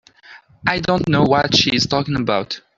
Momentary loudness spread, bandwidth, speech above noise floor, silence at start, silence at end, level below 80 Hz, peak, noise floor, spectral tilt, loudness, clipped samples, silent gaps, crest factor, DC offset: 7 LU; 7.8 kHz; 28 dB; 0.3 s; 0.2 s; -46 dBFS; 0 dBFS; -45 dBFS; -4.5 dB/octave; -17 LUFS; under 0.1%; none; 18 dB; under 0.1%